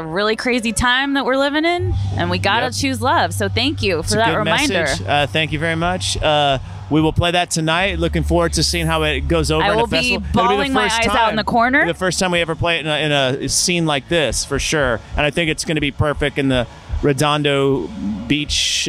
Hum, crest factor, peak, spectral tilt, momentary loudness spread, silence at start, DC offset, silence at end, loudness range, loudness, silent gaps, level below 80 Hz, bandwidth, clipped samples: none; 14 dB; -4 dBFS; -4 dB/octave; 4 LU; 0 s; under 0.1%; 0 s; 2 LU; -17 LUFS; none; -32 dBFS; 15.5 kHz; under 0.1%